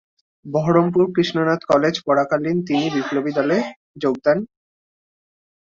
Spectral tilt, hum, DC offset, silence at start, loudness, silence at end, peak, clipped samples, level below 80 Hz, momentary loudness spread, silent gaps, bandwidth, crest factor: -6.5 dB/octave; none; under 0.1%; 0.45 s; -19 LUFS; 1.15 s; -4 dBFS; under 0.1%; -60 dBFS; 7 LU; 3.76-3.94 s; 7.4 kHz; 16 dB